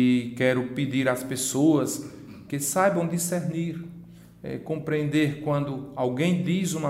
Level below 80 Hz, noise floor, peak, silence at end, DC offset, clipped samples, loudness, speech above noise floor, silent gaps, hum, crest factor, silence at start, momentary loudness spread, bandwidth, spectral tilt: -60 dBFS; -46 dBFS; -8 dBFS; 0 s; under 0.1%; under 0.1%; -26 LUFS; 21 dB; none; none; 18 dB; 0 s; 14 LU; 16 kHz; -5.5 dB/octave